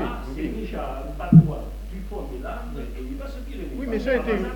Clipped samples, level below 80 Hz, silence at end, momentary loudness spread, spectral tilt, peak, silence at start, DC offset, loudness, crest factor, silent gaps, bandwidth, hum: under 0.1%; -34 dBFS; 0 s; 19 LU; -9 dB/octave; -2 dBFS; 0 s; under 0.1%; -24 LUFS; 22 dB; none; 7.4 kHz; none